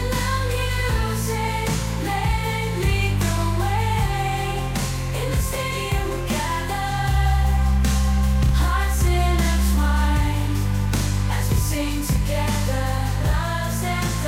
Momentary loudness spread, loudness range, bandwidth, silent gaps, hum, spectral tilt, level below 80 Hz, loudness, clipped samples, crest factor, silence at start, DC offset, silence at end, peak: 4 LU; 3 LU; 16.5 kHz; none; none; -5 dB/octave; -24 dBFS; -22 LUFS; under 0.1%; 12 dB; 0 s; under 0.1%; 0 s; -8 dBFS